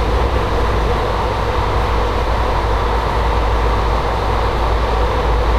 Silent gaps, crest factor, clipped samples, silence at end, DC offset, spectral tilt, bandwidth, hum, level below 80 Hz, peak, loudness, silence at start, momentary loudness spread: none; 12 dB; under 0.1%; 0 s; under 0.1%; -6 dB/octave; 11.5 kHz; none; -18 dBFS; -4 dBFS; -17 LUFS; 0 s; 1 LU